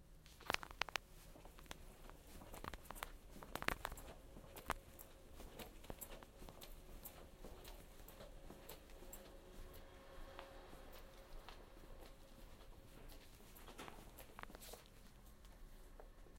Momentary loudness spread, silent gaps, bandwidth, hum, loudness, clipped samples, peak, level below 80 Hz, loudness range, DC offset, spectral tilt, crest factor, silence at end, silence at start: 17 LU; none; 16.5 kHz; none; -54 LUFS; under 0.1%; -14 dBFS; -60 dBFS; 10 LU; under 0.1%; -3 dB/octave; 40 dB; 0 s; 0 s